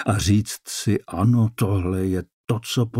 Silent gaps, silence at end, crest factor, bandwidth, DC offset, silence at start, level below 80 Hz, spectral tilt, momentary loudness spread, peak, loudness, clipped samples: 2.33-2.44 s; 0 s; 14 dB; 16 kHz; under 0.1%; 0 s; -44 dBFS; -6 dB/octave; 8 LU; -8 dBFS; -22 LUFS; under 0.1%